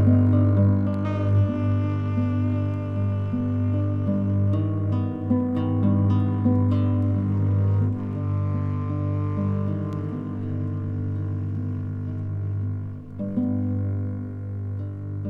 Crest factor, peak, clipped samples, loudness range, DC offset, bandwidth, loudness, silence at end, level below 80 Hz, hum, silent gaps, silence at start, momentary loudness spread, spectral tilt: 16 dB; -8 dBFS; under 0.1%; 6 LU; under 0.1%; 3.4 kHz; -25 LUFS; 0 s; -52 dBFS; 50 Hz at -30 dBFS; none; 0 s; 9 LU; -11.5 dB/octave